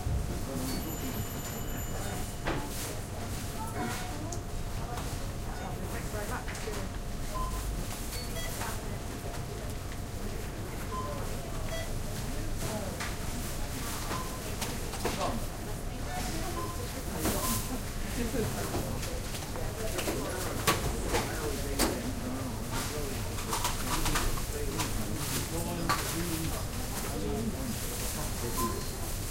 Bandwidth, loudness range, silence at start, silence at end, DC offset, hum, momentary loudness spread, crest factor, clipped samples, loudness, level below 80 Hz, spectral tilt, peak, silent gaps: 16 kHz; 5 LU; 0 s; 0 s; under 0.1%; none; 8 LU; 22 dB; under 0.1%; -35 LUFS; -38 dBFS; -4 dB/octave; -12 dBFS; none